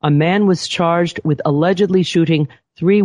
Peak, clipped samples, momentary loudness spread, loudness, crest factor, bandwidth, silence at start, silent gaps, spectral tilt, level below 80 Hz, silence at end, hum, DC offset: -2 dBFS; under 0.1%; 5 LU; -16 LUFS; 12 dB; 10.5 kHz; 0.05 s; none; -6.5 dB/octave; -54 dBFS; 0 s; none; under 0.1%